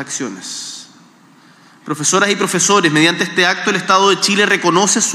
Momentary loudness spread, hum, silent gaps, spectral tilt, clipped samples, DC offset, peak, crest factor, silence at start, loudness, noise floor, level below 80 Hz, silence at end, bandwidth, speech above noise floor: 14 LU; none; none; -2.5 dB/octave; under 0.1%; under 0.1%; 0 dBFS; 16 dB; 0 s; -13 LUFS; -46 dBFS; -72 dBFS; 0 s; 15.5 kHz; 32 dB